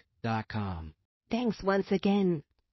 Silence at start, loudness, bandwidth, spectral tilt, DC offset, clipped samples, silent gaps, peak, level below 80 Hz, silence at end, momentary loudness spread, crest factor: 0.25 s; -31 LUFS; 6 kHz; -6 dB/octave; under 0.1%; under 0.1%; 1.05-1.21 s; -14 dBFS; -54 dBFS; 0.3 s; 11 LU; 18 dB